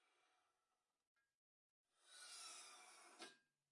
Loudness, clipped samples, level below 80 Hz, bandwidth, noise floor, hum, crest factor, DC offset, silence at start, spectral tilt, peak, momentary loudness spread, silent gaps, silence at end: -59 LUFS; under 0.1%; under -90 dBFS; 12 kHz; under -90 dBFS; none; 22 dB; under 0.1%; 0 s; 1.5 dB/octave; -44 dBFS; 8 LU; 1.07-1.15 s, 1.35-1.85 s; 0.3 s